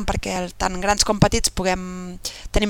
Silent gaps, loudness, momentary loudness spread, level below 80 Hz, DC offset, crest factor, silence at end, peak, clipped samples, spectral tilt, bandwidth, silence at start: none; -21 LUFS; 13 LU; -30 dBFS; under 0.1%; 18 dB; 0 s; -4 dBFS; under 0.1%; -3.5 dB/octave; 18 kHz; 0 s